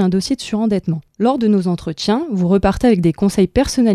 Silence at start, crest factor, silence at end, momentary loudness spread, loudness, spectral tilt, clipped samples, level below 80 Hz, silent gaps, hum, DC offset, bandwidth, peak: 0 s; 14 dB; 0 s; 6 LU; -16 LUFS; -6.5 dB/octave; under 0.1%; -34 dBFS; none; none; under 0.1%; 13.5 kHz; 0 dBFS